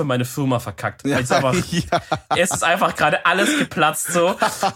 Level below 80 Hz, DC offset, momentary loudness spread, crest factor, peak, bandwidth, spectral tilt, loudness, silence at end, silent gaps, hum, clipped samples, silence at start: -48 dBFS; under 0.1%; 5 LU; 16 dB; -2 dBFS; 17 kHz; -4 dB/octave; -19 LUFS; 0 s; none; none; under 0.1%; 0 s